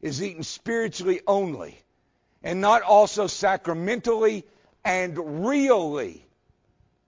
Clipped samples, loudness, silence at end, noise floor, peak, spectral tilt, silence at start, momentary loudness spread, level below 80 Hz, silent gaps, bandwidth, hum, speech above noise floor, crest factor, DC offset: under 0.1%; -23 LUFS; 0.95 s; -69 dBFS; -6 dBFS; -4.5 dB/octave; 0.05 s; 15 LU; -62 dBFS; none; 7.6 kHz; none; 46 dB; 18 dB; under 0.1%